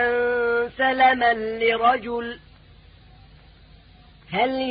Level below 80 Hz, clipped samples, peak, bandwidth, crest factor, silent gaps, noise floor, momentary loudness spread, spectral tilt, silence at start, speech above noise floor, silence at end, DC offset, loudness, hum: -52 dBFS; under 0.1%; -6 dBFS; 5 kHz; 16 dB; none; -50 dBFS; 12 LU; -8.5 dB/octave; 0 s; 29 dB; 0 s; under 0.1%; -21 LUFS; none